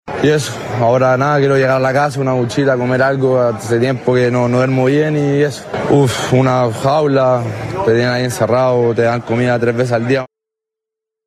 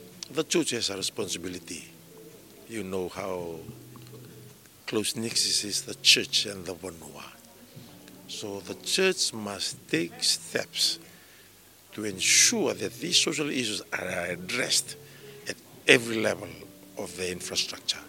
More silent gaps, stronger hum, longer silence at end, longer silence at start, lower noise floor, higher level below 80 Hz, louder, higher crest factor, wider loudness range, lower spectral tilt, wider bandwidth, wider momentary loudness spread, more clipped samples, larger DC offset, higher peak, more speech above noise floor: neither; neither; first, 1 s vs 0 s; about the same, 0.05 s vs 0 s; first, -83 dBFS vs -54 dBFS; first, -48 dBFS vs -68 dBFS; first, -14 LUFS vs -26 LUFS; second, 12 dB vs 30 dB; second, 1 LU vs 9 LU; first, -6.5 dB/octave vs -1.5 dB/octave; second, 13.5 kHz vs 17 kHz; second, 4 LU vs 22 LU; neither; neither; about the same, -2 dBFS vs 0 dBFS; first, 69 dB vs 26 dB